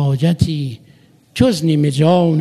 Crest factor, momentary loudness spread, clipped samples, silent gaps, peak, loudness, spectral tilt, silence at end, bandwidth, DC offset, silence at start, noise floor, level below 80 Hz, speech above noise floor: 14 dB; 12 LU; under 0.1%; none; 0 dBFS; -15 LUFS; -7 dB/octave; 0 s; 13.5 kHz; under 0.1%; 0 s; -48 dBFS; -44 dBFS; 34 dB